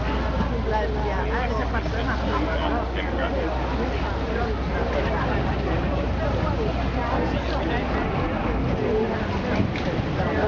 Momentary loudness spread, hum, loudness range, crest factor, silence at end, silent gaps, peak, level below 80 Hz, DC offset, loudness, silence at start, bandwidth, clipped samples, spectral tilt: 2 LU; none; 1 LU; 14 dB; 0 s; none; -10 dBFS; -28 dBFS; under 0.1%; -25 LUFS; 0 s; 7 kHz; under 0.1%; -7.5 dB/octave